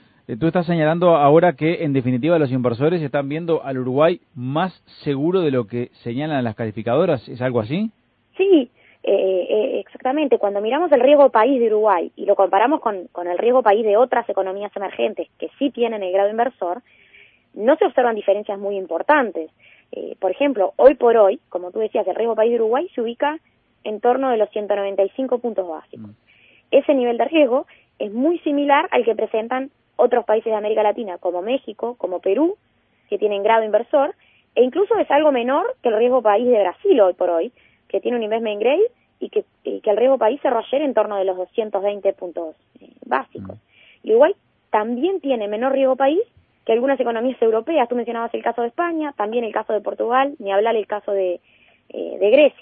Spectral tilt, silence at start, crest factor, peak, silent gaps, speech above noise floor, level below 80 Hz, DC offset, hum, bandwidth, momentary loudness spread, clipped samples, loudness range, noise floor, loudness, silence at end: -11.5 dB/octave; 0.3 s; 18 dB; 0 dBFS; none; 33 dB; -64 dBFS; under 0.1%; none; 4.8 kHz; 12 LU; under 0.1%; 5 LU; -51 dBFS; -19 LUFS; 0.1 s